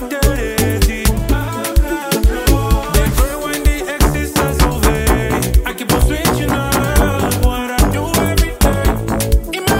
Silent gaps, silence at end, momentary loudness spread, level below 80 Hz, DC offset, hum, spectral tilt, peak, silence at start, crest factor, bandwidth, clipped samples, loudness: none; 0 s; 3 LU; -18 dBFS; under 0.1%; none; -5 dB/octave; 0 dBFS; 0 s; 14 dB; 16.5 kHz; under 0.1%; -16 LUFS